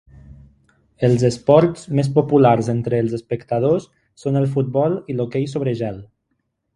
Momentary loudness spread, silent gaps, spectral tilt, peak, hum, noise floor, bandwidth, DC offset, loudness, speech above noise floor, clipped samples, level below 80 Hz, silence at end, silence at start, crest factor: 9 LU; none; -8 dB/octave; 0 dBFS; none; -72 dBFS; 11.5 kHz; under 0.1%; -19 LUFS; 54 dB; under 0.1%; -52 dBFS; 0.7 s; 0.25 s; 20 dB